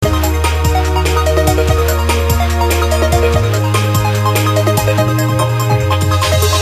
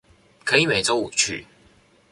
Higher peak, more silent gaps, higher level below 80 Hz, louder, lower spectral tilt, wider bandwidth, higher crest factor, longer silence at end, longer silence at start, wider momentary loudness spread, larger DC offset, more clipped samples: about the same, 0 dBFS vs -2 dBFS; neither; first, -18 dBFS vs -56 dBFS; first, -13 LUFS vs -20 LUFS; first, -5 dB/octave vs -2 dB/octave; first, 15.5 kHz vs 11.5 kHz; second, 12 dB vs 22 dB; second, 0 s vs 0.7 s; second, 0 s vs 0.45 s; second, 2 LU vs 12 LU; neither; neither